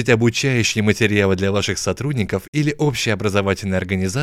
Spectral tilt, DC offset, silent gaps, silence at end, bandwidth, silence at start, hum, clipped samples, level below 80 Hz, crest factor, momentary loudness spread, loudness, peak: -5 dB/octave; under 0.1%; 2.48-2.53 s; 0 s; 15.5 kHz; 0 s; none; under 0.1%; -48 dBFS; 16 dB; 5 LU; -19 LUFS; -2 dBFS